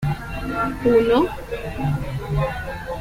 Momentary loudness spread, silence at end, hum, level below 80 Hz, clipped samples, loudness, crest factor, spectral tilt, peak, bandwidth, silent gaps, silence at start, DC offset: 13 LU; 0 s; none; -36 dBFS; under 0.1%; -22 LUFS; 16 dB; -7.5 dB/octave; -6 dBFS; 16.5 kHz; none; 0 s; under 0.1%